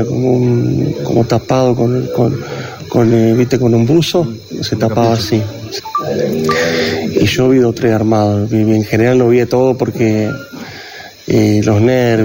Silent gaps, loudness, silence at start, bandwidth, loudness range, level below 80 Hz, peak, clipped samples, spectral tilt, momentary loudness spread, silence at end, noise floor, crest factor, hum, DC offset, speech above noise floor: none; -13 LUFS; 0 s; 16.5 kHz; 2 LU; -42 dBFS; -2 dBFS; under 0.1%; -6.5 dB/octave; 11 LU; 0 s; -32 dBFS; 10 dB; none; under 0.1%; 20 dB